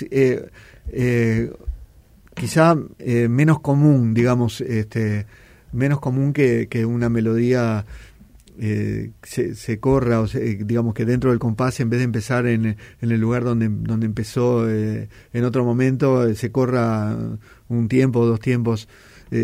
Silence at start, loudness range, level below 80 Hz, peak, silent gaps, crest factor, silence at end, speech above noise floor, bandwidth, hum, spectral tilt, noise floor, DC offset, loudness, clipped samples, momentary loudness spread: 0 s; 4 LU; -44 dBFS; -2 dBFS; none; 18 dB; 0 s; 30 dB; 15 kHz; none; -8 dB/octave; -49 dBFS; under 0.1%; -20 LUFS; under 0.1%; 11 LU